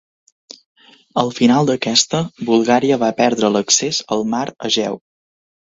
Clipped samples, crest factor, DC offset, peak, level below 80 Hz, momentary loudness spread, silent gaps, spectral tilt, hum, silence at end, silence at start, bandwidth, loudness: under 0.1%; 18 dB; under 0.1%; 0 dBFS; -58 dBFS; 7 LU; none; -3.5 dB/octave; none; 0.8 s; 1.15 s; 8 kHz; -16 LUFS